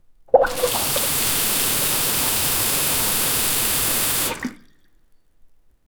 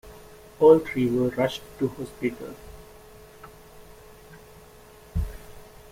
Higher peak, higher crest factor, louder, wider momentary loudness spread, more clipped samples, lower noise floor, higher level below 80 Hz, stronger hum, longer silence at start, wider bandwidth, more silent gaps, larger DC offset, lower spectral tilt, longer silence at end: first, -2 dBFS vs -6 dBFS; about the same, 20 dB vs 22 dB; first, -18 LUFS vs -24 LUFS; second, 3 LU vs 29 LU; neither; first, -54 dBFS vs -49 dBFS; about the same, -44 dBFS vs -44 dBFS; neither; first, 0.35 s vs 0.05 s; first, over 20 kHz vs 16 kHz; neither; neither; second, -1.5 dB/octave vs -7 dB/octave; first, 0.55 s vs 0.25 s